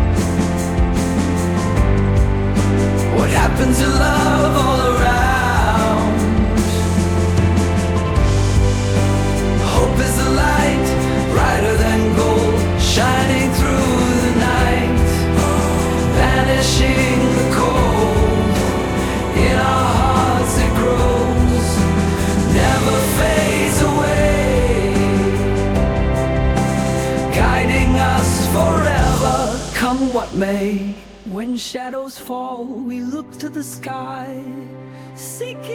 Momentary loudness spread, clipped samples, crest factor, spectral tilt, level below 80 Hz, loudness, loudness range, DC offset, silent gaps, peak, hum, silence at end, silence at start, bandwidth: 11 LU; under 0.1%; 14 dB; -5.5 dB/octave; -24 dBFS; -16 LUFS; 6 LU; under 0.1%; none; 0 dBFS; none; 0 s; 0 s; 19 kHz